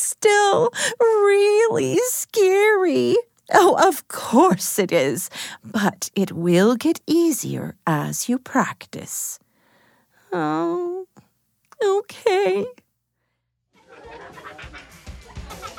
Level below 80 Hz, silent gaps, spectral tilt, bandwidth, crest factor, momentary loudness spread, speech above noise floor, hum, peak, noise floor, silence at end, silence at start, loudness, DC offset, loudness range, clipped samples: -54 dBFS; none; -4 dB/octave; 20 kHz; 20 dB; 20 LU; 55 dB; none; -2 dBFS; -74 dBFS; 0.05 s; 0 s; -19 LUFS; under 0.1%; 9 LU; under 0.1%